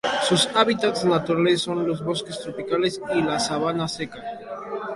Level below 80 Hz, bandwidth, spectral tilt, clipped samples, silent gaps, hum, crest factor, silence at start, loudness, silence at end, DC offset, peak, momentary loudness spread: -58 dBFS; 11.5 kHz; -4 dB/octave; under 0.1%; none; none; 20 dB; 0.05 s; -23 LUFS; 0 s; under 0.1%; -4 dBFS; 13 LU